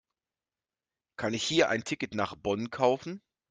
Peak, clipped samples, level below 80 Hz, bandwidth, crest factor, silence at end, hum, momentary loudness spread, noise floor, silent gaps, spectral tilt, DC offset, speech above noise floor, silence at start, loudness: -10 dBFS; under 0.1%; -66 dBFS; 9.6 kHz; 22 dB; 0.3 s; none; 14 LU; under -90 dBFS; none; -4 dB/octave; under 0.1%; over 60 dB; 1.2 s; -30 LUFS